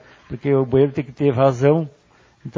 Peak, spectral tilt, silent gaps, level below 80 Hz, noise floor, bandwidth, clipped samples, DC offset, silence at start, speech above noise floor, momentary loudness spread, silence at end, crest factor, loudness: -2 dBFS; -8.5 dB/octave; none; -50 dBFS; -39 dBFS; 7.4 kHz; under 0.1%; under 0.1%; 0.3 s; 22 dB; 17 LU; 0.05 s; 16 dB; -18 LUFS